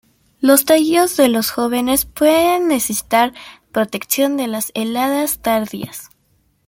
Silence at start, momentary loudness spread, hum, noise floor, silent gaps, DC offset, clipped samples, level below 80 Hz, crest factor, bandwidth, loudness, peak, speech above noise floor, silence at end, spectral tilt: 0.4 s; 8 LU; none; -60 dBFS; none; under 0.1%; under 0.1%; -50 dBFS; 16 dB; 17 kHz; -16 LUFS; 0 dBFS; 44 dB; 0.6 s; -3 dB/octave